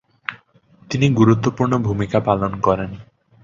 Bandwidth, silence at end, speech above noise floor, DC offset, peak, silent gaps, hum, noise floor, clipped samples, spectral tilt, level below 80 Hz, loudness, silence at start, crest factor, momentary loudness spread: 7.6 kHz; 0.4 s; 35 dB; under 0.1%; -2 dBFS; none; none; -52 dBFS; under 0.1%; -7.5 dB/octave; -44 dBFS; -18 LUFS; 0.3 s; 18 dB; 16 LU